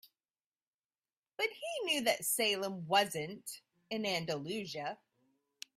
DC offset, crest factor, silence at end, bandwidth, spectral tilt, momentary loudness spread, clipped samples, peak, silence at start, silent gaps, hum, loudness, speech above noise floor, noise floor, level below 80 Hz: under 0.1%; 24 dB; 0.85 s; 15.5 kHz; -2.5 dB/octave; 16 LU; under 0.1%; -14 dBFS; 0.05 s; 0.46-0.52 s, 0.67-0.89 s, 1.17-1.22 s; none; -35 LUFS; over 54 dB; under -90 dBFS; -80 dBFS